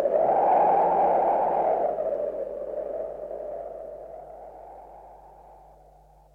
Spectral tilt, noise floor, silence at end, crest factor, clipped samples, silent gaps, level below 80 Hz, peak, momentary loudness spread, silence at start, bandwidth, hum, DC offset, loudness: -8 dB/octave; -54 dBFS; 0.8 s; 14 dB; under 0.1%; none; -58 dBFS; -12 dBFS; 23 LU; 0 s; 4 kHz; none; under 0.1%; -25 LUFS